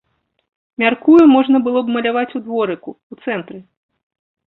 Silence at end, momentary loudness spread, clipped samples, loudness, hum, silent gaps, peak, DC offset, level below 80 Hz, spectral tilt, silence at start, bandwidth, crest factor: 0.9 s; 20 LU; under 0.1%; -15 LUFS; none; 3.03-3.10 s; -2 dBFS; under 0.1%; -60 dBFS; -7.5 dB/octave; 0.8 s; 4.5 kHz; 14 dB